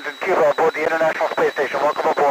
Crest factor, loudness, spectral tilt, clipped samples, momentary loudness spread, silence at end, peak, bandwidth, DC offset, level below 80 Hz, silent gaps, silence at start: 10 dB; -19 LUFS; -4 dB/octave; under 0.1%; 3 LU; 0 s; -8 dBFS; 16 kHz; under 0.1%; -66 dBFS; none; 0 s